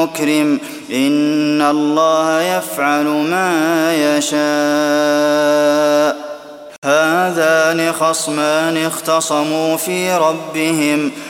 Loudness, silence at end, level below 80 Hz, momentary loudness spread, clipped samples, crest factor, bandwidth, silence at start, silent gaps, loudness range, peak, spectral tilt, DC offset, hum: -15 LUFS; 0 s; -66 dBFS; 5 LU; under 0.1%; 14 dB; 17 kHz; 0 s; 6.78-6.82 s; 1 LU; 0 dBFS; -3.5 dB/octave; under 0.1%; none